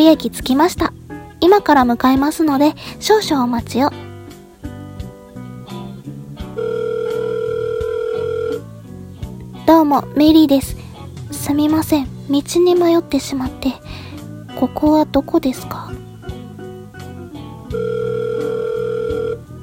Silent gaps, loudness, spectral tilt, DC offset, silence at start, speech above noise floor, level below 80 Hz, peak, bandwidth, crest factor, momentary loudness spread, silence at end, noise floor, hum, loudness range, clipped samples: none; -16 LUFS; -5.5 dB/octave; under 0.1%; 0 s; 22 dB; -40 dBFS; 0 dBFS; 17 kHz; 18 dB; 21 LU; 0 s; -37 dBFS; none; 9 LU; under 0.1%